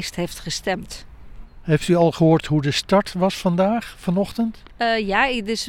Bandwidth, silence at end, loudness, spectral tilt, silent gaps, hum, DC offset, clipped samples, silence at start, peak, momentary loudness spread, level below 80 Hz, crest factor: 16.5 kHz; 0 s; -20 LUFS; -5.5 dB/octave; none; none; under 0.1%; under 0.1%; 0 s; -4 dBFS; 10 LU; -44 dBFS; 18 dB